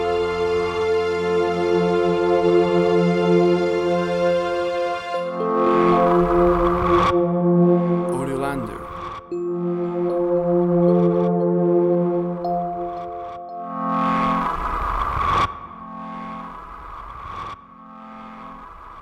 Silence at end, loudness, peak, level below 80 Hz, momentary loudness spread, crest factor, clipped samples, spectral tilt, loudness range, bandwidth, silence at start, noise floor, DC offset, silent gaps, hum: 0 s; -20 LUFS; -6 dBFS; -40 dBFS; 18 LU; 14 dB; under 0.1%; -8 dB/octave; 8 LU; 11.5 kHz; 0 s; -42 dBFS; under 0.1%; none; none